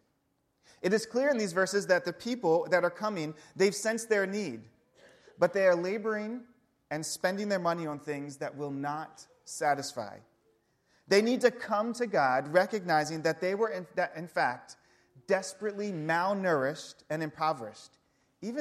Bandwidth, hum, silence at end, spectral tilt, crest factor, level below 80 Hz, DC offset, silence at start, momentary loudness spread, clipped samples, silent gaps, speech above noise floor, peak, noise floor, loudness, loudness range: 14.5 kHz; none; 0 s; -4.5 dB/octave; 20 dB; -78 dBFS; under 0.1%; 0.85 s; 13 LU; under 0.1%; none; 46 dB; -10 dBFS; -76 dBFS; -30 LUFS; 5 LU